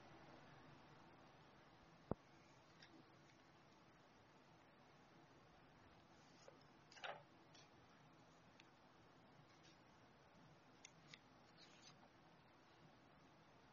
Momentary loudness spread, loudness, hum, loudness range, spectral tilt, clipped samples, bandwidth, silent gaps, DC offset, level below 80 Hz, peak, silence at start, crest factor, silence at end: 14 LU; -64 LUFS; none; 7 LU; -4 dB/octave; under 0.1%; 7 kHz; none; under 0.1%; -82 dBFS; -24 dBFS; 0 s; 40 dB; 0 s